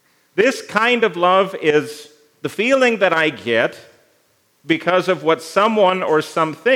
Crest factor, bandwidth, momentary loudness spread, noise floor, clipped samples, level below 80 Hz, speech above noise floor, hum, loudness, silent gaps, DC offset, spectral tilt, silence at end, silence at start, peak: 18 dB; 16 kHz; 7 LU; -60 dBFS; under 0.1%; -76 dBFS; 43 dB; none; -17 LUFS; none; under 0.1%; -4.5 dB/octave; 0 s; 0.35 s; 0 dBFS